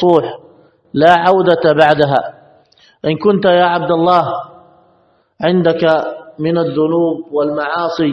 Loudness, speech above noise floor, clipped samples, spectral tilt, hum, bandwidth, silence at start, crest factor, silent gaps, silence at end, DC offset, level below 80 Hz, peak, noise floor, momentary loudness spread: -13 LUFS; 42 dB; 0.2%; -7.5 dB/octave; none; 7.8 kHz; 0 s; 14 dB; none; 0 s; under 0.1%; -54 dBFS; 0 dBFS; -55 dBFS; 12 LU